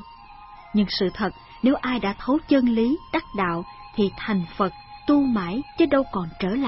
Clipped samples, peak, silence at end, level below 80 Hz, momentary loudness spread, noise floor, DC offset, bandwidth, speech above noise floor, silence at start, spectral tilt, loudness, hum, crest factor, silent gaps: under 0.1%; -8 dBFS; 0 s; -46 dBFS; 9 LU; -44 dBFS; under 0.1%; 5.8 kHz; 22 dB; 0 s; -10 dB/octave; -24 LUFS; none; 16 dB; none